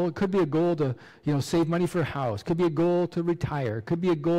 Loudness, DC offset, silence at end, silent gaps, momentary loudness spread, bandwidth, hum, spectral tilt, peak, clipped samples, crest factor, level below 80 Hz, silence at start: -26 LUFS; under 0.1%; 0 s; none; 5 LU; 13.5 kHz; none; -7.5 dB/octave; -18 dBFS; under 0.1%; 8 dB; -54 dBFS; 0 s